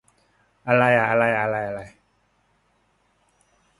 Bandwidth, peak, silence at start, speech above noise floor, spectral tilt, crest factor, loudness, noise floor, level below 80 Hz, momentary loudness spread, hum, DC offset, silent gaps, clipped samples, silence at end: 11.5 kHz; -4 dBFS; 0.65 s; 46 dB; -7 dB/octave; 20 dB; -20 LUFS; -66 dBFS; -60 dBFS; 17 LU; none; under 0.1%; none; under 0.1%; 1.9 s